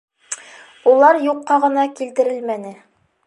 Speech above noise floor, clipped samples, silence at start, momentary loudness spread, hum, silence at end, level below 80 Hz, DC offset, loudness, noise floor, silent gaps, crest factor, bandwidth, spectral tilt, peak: 27 dB; under 0.1%; 0.3 s; 18 LU; none; 0.55 s; -78 dBFS; under 0.1%; -16 LUFS; -43 dBFS; none; 16 dB; 11.5 kHz; -3.5 dB/octave; -2 dBFS